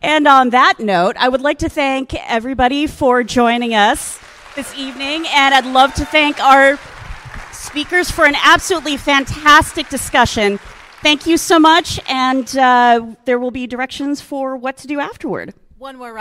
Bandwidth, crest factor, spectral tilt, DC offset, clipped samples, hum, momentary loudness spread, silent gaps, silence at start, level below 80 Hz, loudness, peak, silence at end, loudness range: 16.5 kHz; 14 dB; -3 dB/octave; under 0.1%; 0.2%; none; 16 LU; none; 0.05 s; -38 dBFS; -13 LUFS; 0 dBFS; 0 s; 3 LU